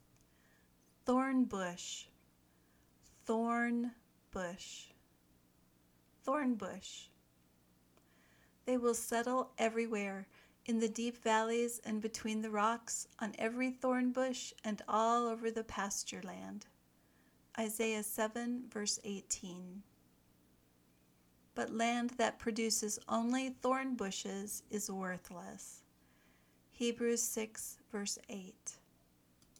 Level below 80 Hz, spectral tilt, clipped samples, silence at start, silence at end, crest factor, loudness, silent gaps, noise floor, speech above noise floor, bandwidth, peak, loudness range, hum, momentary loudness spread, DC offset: -72 dBFS; -3 dB/octave; under 0.1%; 1.05 s; 0.85 s; 22 dB; -38 LUFS; none; -71 dBFS; 33 dB; 19.5 kHz; -18 dBFS; 6 LU; none; 15 LU; under 0.1%